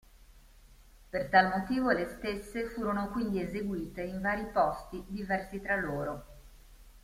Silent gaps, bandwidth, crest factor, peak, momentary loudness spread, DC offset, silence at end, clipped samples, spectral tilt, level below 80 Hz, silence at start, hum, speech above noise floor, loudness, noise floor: none; 16 kHz; 22 dB; -10 dBFS; 13 LU; under 0.1%; 0.05 s; under 0.1%; -6.5 dB/octave; -52 dBFS; 0.15 s; none; 25 dB; -32 LUFS; -57 dBFS